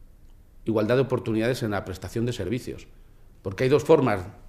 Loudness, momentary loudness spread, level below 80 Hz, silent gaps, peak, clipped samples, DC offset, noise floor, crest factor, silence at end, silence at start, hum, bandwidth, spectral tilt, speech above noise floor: -25 LUFS; 16 LU; -48 dBFS; none; -4 dBFS; under 0.1%; under 0.1%; -50 dBFS; 20 dB; 0 s; 0 s; none; 15.5 kHz; -7 dB/octave; 25 dB